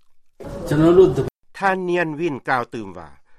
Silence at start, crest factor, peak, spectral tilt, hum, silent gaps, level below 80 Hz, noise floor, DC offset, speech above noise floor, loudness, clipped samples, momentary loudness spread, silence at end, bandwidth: 0.4 s; 18 dB; -2 dBFS; -7.5 dB/octave; none; none; -44 dBFS; -39 dBFS; under 0.1%; 21 dB; -19 LUFS; under 0.1%; 19 LU; 0.25 s; 13 kHz